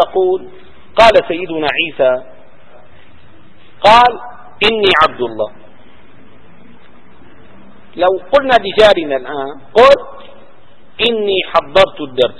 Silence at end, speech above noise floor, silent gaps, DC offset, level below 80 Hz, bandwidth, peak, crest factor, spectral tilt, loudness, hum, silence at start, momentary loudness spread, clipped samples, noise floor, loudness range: 0.1 s; 35 dB; none; 3%; -44 dBFS; 11 kHz; 0 dBFS; 14 dB; -4.5 dB/octave; -12 LUFS; none; 0 s; 14 LU; 0.6%; -46 dBFS; 5 LU